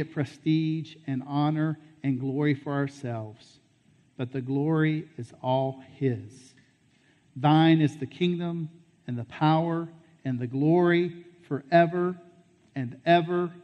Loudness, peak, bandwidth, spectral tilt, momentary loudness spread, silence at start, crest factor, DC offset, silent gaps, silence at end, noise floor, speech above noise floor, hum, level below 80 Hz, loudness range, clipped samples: -27 LUFS; -10 dBFS; 8.8 kHz; -8 dB/octave; 15 LU; 0 s; 18 dB; under 0.1%; none; 0.05 s; -63 dBFS; 37 dB; none; -72 dBFS; 5 LU; under 0.1%